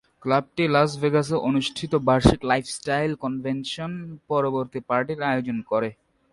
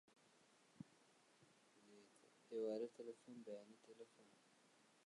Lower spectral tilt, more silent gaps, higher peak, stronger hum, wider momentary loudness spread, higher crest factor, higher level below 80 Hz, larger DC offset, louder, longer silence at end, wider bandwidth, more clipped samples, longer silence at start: about the same, -6 dB/octave vs -5.5 dB/octave; neither; first, 0 dBFS vs -36 dBFS; neither; second, 9 LU vs 20 LU; about the same, 24 dB vs 20 dB; first, -42 dBFS vs under -90 dBFS; neither; first, -24 LUFS vs -52 LUFS; first, 0.4 s vs 0.25 s; about the same, 11.5 kHz vs 11 kHz; neither; second, 0.25 s vs 0.5 s